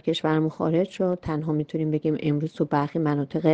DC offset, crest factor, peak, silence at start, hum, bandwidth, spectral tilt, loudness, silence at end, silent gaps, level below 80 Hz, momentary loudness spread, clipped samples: under 0.1%; 18 dB; -6 dBFS; 0.05 s; none; 8 kHz; -8 dB/octave; -25 LUFS; 0 s; none; -56 dBFS; 3 LU; under 0.1%